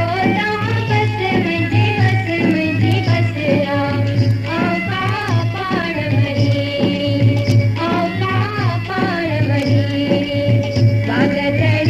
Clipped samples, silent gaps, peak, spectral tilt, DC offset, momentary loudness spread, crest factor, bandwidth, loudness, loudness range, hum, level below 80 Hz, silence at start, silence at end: under 0.1%; none; -2 dBFS; -7.5 dB/octave; under 0.1%; 3 LU; 14 dB; 7.6 kHz; -16 LUFS; 1 LU; none; -42 dBFS; 0 s; 0 s